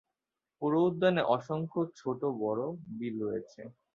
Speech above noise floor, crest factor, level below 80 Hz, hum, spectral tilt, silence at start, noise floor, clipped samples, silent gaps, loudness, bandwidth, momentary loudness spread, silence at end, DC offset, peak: 58 dB; 18 dB; -74 dBFS; none; -8 dB/octave; 0.6 s; -89 dBFS; under 0.1%; none; -32 LUFS; 7.4 kHz; 12 LU; 0.25 s; under 0.1%; -14 dBFS